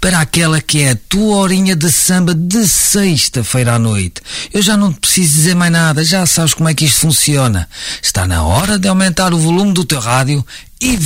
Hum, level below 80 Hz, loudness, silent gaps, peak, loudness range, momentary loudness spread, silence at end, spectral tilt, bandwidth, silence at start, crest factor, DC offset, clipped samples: none; -32 dBFS; -11 LUFS; none; 0 dBFS; 2 LU; 7 LU; 0 s; -4 dB/octave; 16.5 kHz; 0 s; 12 dB; under 0.1%; under 0.1%